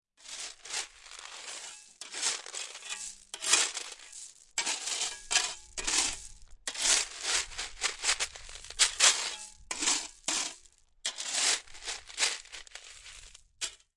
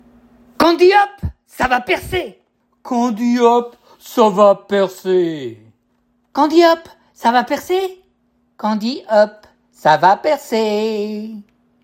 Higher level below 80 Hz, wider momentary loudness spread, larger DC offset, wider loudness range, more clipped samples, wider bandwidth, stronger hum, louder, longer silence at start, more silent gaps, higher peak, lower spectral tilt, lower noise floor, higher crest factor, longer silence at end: second, -58 dBFS vs -46 dBFS; first, 19 LU vs 15 LU; neither; first, 5 LU vs 2 LU; neither; second, 11.5 kHz vs 16.5 kHz; neither; second, -30 LUFS vs -16 LUFS; second, 0.2 s vs 0.6 s; neither; second, -8 dBFS vs 0 dBFS; second, 2.5 dB/octave vs -5 dB/octave; about the same, -59 dBFS vs -62 dBFS; first, 26 dB vs 16 dB; second, 0.2 s vs 0.4 s